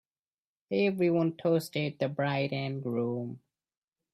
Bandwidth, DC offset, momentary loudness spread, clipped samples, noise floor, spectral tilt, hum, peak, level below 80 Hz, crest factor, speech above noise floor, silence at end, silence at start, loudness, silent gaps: 14.5 kHz; under 0.1%; 7 LU; under 0.1%; under -90 dBFS; -7 dB/octave; none; -16 dBFS; -74 dBFS; 16 dB; over 60 dB; 0.75 s; 0.7 s; -30 LUFS; none